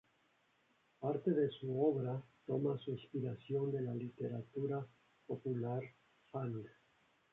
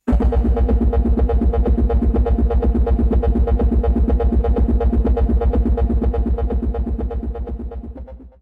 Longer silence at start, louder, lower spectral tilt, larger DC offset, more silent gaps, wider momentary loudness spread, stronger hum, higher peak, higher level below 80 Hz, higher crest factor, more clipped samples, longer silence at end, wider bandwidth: first, 1 s vs 0.05 s; second, -41 LUFS vs -19 LUFS; second, -8.5 dB/octave vs -11.5 dB/octave; neither; neither; about the same, 11 LU vs 10 LU; neither; second, -22 dBFS vs -8 dBFS; second, -80 dBFS vs -18 dBFS; first, 18 dB vs 8 dB; neither; first, 0.65 s vs 0.15 s; first, 4 kHz vs 3.2 kHz